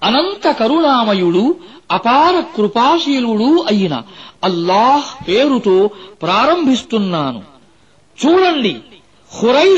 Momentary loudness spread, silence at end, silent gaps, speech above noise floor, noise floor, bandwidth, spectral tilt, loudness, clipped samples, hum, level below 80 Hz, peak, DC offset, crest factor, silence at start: 8 LU; 0 s; none; 38 dB; -51 dBFS; 8.2 kHz; -5.5 dB/octave; -14 LUFS; under 0.1%; none; -54 dBFS; -2 dBFS; 0.2%; 12 dB; 0 s